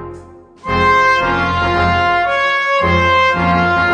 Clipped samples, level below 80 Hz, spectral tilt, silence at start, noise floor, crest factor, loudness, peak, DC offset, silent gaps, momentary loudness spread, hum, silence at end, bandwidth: under 0.1%; -34 dBFS; -5.5 dB/octave; 0 s; -37 dBFS; 14 dB; -13 LUFS; 0 dBFS; under 0.1%; none; 4 LU; none; 0 s; 9.6 kHz